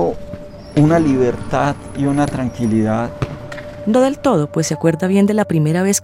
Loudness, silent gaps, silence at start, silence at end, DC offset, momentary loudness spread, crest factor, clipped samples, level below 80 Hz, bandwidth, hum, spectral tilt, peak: -17 LUFS; none; 0 s; 0 s; under 0.1%; 12 LU; 16 dB; under 0.1%; -40 dBFS; 16 kHz; none; -6 dB/octave; 0 dBFS